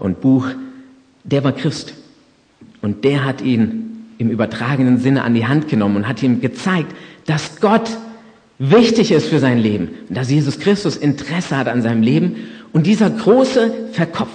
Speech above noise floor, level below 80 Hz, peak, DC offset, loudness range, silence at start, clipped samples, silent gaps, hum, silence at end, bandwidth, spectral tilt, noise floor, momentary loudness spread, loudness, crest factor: 36 dB; -56 dBFS; 0 dBFS; under 0.1%; 5 LU; 0 s; under 0.1%; none; none; 0 s; 9.6 kHz; -6.5 dB/octave; -52 dBFS; 13 LU; -16 LUFS; 16 dB